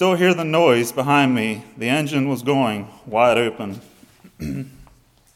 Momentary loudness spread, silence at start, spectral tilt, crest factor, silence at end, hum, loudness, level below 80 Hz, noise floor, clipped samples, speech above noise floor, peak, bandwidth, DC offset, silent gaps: 15 LU; 0 s; -5.5 dB/octave; 18 dB; 0.55 s; none; -19 LUFS; -52 dBFS; -53 dBFS; under 0.1%; 34 dB; -2 dBFS; 16.5 kHz; under 0.1%; none